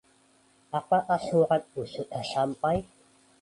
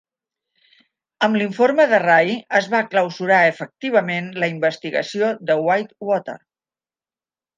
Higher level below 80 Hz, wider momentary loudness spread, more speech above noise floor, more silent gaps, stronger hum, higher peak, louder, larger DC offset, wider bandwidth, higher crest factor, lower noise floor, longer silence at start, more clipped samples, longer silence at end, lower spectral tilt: first, -58 dBFS vs -74 dBFS; about the same, 11 LU vs 9 LU; second, 36 dB vs over 72 dB; neither; neither; second, -12 dBFS vs -2 dBFS; second, -28 LUFS vs -19 LUFS; neither; first, 11.5 kHz vs 8.8 kHz; about the same, 18 dB vs 18 dB; second, -63 dBFS vs under -90 dBFS; second, 0.75 s vs 1.2 s; neither; second, 0.6 s vs 1.2 s; about the same, -6 dB/octave vs -5.5 dB/octave